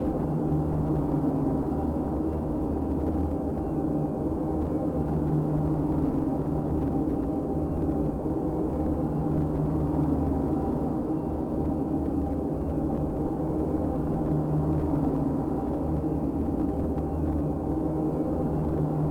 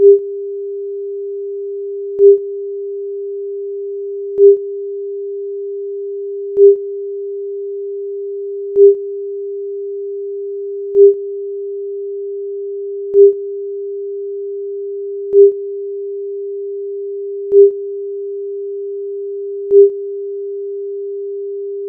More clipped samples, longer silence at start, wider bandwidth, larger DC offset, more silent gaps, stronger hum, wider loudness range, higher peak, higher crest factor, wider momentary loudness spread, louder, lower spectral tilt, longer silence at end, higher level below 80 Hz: neither; about the same, 0 s vs 0 s; first, 9.6 kHz vs 0.7 kHz; neither; neither; neither; about the same, 1 LU vs 2 LU; second, -14 dBFS vs 0 dBFS; about the same, 12 dB vs 16 dB; second, 3 LU vs 14 LU; second, -28 LUFS vs -17 LUFS; about the same, -11 dB/octave vs -11.5 dB/octave; about the same, 0 s vs 0 s; first, -36 dBFS vs -70 dBFS